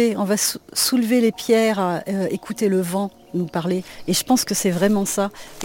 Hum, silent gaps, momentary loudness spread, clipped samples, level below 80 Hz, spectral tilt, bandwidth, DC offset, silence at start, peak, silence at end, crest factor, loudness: none; none; 8 LU; under 0.1%; -54 dBFS; -4 dB/octave; 17 kHz; under 0.1%; 0 s; -6 dBFS; 0 s; 16 dB; -20 LUFS